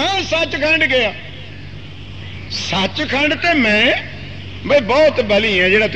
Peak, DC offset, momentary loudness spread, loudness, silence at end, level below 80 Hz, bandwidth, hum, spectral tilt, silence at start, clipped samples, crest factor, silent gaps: -2 dBFS; 1%; 20 LU; -14 LUFS; 0 s; -42 dBFS; 8.8 kHz; none; -4.5 dB/octave; 0 s; under 0.1%; 16 dB; none